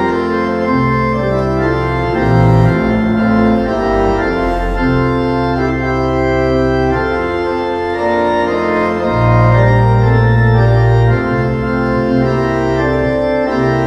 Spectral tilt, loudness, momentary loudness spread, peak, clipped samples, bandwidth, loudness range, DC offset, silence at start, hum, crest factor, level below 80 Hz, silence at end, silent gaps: -8.5 dB/octave; -13 LUFS; 5 LU; 0 dBFS; under 0.1%; 7.4 kHz; 3 LU; under 0.1%; 0 s; none; 12 dB; -26 dBFS; 0 s; none